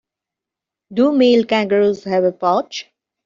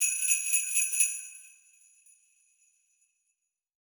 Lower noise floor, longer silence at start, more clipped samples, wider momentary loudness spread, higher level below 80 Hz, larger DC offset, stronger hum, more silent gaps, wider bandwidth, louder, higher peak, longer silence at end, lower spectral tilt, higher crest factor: about the same, -85 dBFS vs -82 dBFS; first, 0.9 s vs 0 s; neither; second, 12 LU vs 19 LU; first, -62 dBFS vs under -90 dBFS; neither; neither; neither; second, 7.4 kHz vs over 20 kHz; first, -16 LUFS vs -25 LUFS; first, -4 dBFS vs -8 dBFS; second, 0.45 s vs 2.4 s; first, -4 dB/octave vs 9 dB/octave; second, 14 dB vs 24 dB